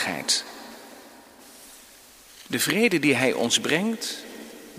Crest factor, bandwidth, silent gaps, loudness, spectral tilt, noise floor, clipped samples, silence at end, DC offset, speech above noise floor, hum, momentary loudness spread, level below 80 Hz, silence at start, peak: 22 dB; 15.5 kHz; none; -23 LUFS; -2.5 dB/octave; -50 dBFS; under 0.1%; 0 s; under 0.1%; 26 dB; none; 24 LU; -68 dBFS; 0 s; -6 dBFS